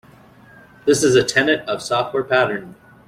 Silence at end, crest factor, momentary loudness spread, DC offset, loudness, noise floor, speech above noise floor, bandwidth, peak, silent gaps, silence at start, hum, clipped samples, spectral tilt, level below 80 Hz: 0.35 s; 16 dB; 8 LU; under 0.1%; -18 LUFS; -47 dBFS; 29 dB; 15.5 kHz; -2 dBFS; none; 0.85 s; none; under 0.1%; -3.5 dB/octave; -56 dBFS